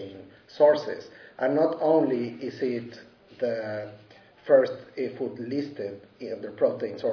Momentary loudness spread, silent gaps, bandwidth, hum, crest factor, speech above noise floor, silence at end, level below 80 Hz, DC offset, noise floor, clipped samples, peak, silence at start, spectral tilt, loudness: 20 LU; none; 5.4 kHz; none; 20 dB; 20 dB; 0 s; -74 dBFS; under 0.1%; -46 dBFS; under 0.1%; -8 dBFS; 0 s; -7.5 dB/octave; -27 LUFS